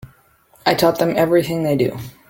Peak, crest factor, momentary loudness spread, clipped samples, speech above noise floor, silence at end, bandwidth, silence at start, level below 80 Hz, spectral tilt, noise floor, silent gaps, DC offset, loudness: 0 dBFS; 18 dB; 5 LU; under 0.1%; 37 dB; 0.2 s; 17 kHz; 0.05 s; -52 dBFS; -6 dB/octave; -54 dBFS; none; under 0.1%; -18 LUFS